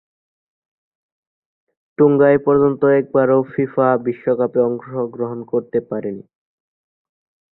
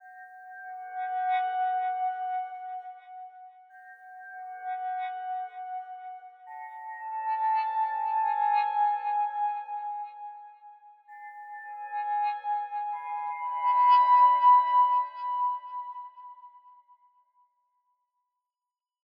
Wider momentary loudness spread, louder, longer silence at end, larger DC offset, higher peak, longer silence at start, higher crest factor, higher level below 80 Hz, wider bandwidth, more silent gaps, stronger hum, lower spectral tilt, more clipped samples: second, 13 LU vs 25 LU; first, -17 LUFS vs -27 LUFS; second, 1.35 s vs 2.6 s; neither; first, -2 dBFS vs -12 dBFS; first, 2 s vs 0.05 s; about the same, 16 dB vs 18 dB; first, -58 dBFS vs under -90 dBFS; second, 4 kHz vs 5.2 kHz; neither; neither; first, -12.5 dB/octave vs 3 dB/octave; neither